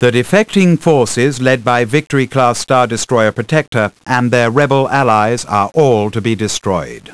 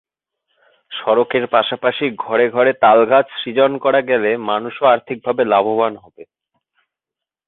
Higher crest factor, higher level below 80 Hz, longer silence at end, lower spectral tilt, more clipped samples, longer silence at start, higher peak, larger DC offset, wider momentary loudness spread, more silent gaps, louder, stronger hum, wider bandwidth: about the same, 12 dB vs 16 dB; first, -48 dBFS vs -64 dBFS; second, 0 s vs 1.25 s; second, -5.5 dB/octave vs -9.5 dB/octave; first, 0.4% vs under 0.1%; second, 0 s vs 0.9 s; about the same, 0 dBFS vs -2 dBFS; first, 1% vs under 0.1%; second, 5 LU vs 9 LU; first, 3.68-3.72 s vs none; first, -13 LUFS vs -16 LUFS; neither; first, 11 kHz vs 4.1 kHz